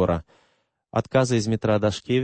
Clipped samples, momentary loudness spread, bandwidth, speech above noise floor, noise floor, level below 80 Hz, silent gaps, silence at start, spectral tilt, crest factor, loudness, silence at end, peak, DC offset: under 0.1%; 8 LU; 8.8 kHz; 45 dB; -67 dBFS; -48 dBFS; none; 0 s; -6 dB/octave; 16 dB; -23 LUFS; 0 s; -8 dBFS; under 0.1%